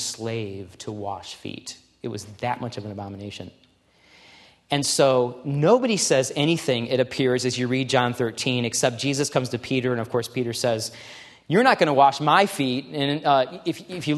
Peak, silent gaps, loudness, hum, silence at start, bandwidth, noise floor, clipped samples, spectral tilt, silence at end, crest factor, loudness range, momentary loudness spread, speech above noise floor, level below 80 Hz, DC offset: -2 dBFS; none; -22 LUFS; none; 0 s; 13 kHz; -58 dBFS; under 0.1%; -4 dB/octave; 0 s; 22 dB; 12 LU; 17 LU; 36 dB; -64 dBFS; under 0.1%